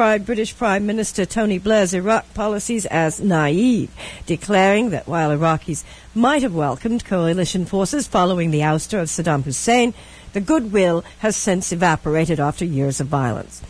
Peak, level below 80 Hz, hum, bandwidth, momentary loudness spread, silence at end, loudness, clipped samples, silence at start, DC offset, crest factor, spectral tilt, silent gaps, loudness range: -4 dBFS; -42 dBFS; none; 11 kHz; 7 LU; 0 s; -19 LUFS; under 0.1%; 0 s; under 0.1%; 16 dB; -5 dB/octave; none; 1 LU